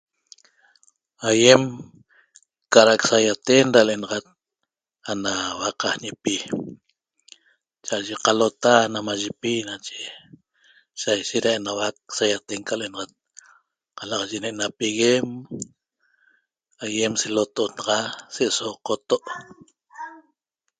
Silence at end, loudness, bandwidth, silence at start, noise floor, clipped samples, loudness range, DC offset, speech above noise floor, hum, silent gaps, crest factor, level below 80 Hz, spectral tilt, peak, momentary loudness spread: 0.6 s; -21 LUFS; 9.6 kHz; 1.2 s; -82 dBFS; under 0.1%; 9 LU; under 0.1%; 60 dB; none; none; 24 dB; -66 dBFS; -3 dB/octave; 0 dBFS; 19 LU